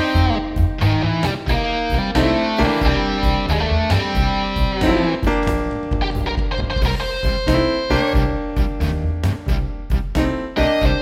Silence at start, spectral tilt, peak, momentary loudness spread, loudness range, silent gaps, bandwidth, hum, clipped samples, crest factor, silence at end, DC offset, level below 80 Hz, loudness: 0 s; -6.5 dB/octave; -4 dBFS; 5 LU; 2 LU; none; 14.5 kHz; none; under 0.1%; 14 dB; 0 s; under 0.1%; -22 dBFS; -19 LUFS